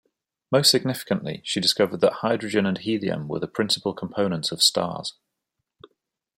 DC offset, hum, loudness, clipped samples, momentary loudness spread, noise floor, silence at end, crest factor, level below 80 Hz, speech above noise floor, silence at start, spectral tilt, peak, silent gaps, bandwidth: under 0.1%; none; -23 LUFS; under 0.1%; 10 LU; -81 dBFS; 1.25 s; 22 dB; -66 dBFS; 58 dB; 0.5 s; -3.5 dB/octave; -4 dBFS; none; 16 kHz